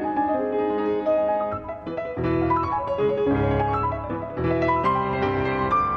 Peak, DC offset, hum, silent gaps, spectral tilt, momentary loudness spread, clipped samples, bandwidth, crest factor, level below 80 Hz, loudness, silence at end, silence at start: -12 dBFS; under 0.1%; none; none; -9 dB/octave; 7 LU; under 0.1%; 6.6 kHz; 12 dB; -42 dBFS; -24 LUFS; 0 s; 0 s